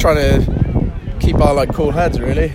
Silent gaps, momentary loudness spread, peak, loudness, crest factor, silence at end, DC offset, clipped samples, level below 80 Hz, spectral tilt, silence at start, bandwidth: none; 6 LU; 0 dBFS; -16 LUFS; 14 dB; 0 s; under 0.1%; under 0.1%; -20 dBFS; -7 dB/octave; 0 s; 16 kHz